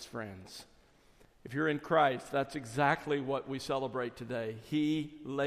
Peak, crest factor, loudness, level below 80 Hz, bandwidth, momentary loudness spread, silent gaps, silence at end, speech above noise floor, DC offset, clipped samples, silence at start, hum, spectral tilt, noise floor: -14 dBFS; 20 dB; -34 LUFS; -66 dBFS; 15 kHz; 15 LU; none; 0 s; 29 dB; under 0.1%; under 0.1%; 0 s; none; -5.5 dB/octave; -63 dBFS